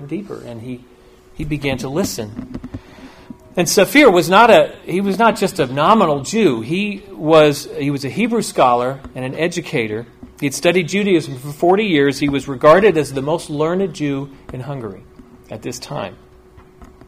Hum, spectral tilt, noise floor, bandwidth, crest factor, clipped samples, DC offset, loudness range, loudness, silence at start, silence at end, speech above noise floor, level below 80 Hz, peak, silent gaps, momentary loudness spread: none; -5 dB/octave; -44 dBFS; 16 kHz; 16 dB; under 0.1%; under 0.1%; 11 LU; -16 LUFS; 0 s; 0.2 s; 28 dB; -46 dBFS; 0 dBFS; none; 20 LU